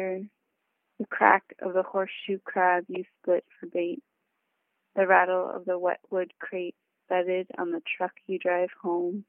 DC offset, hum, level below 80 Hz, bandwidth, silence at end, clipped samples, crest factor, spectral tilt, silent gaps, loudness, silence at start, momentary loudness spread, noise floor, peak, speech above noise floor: under 0.1%; none; -84 dBFS; 3.7 kHz; 0.05 s; under 0.1%; 24 dB; -9 dB/octave; none; -28 LUFS; 0 s; 14 LU; -79 dBFS; -4 dBFS; 51 dB